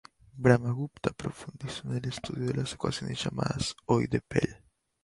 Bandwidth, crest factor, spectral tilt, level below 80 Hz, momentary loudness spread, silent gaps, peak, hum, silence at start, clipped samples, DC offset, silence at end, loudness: 11.5 kHz; 24 dB; -6 dB/octave; -54 dBFS; 13 LU; none; -8 dBFS; none; 0.35 s; under 0.1%; under 0.1%; 0.5 s; -31 LUFS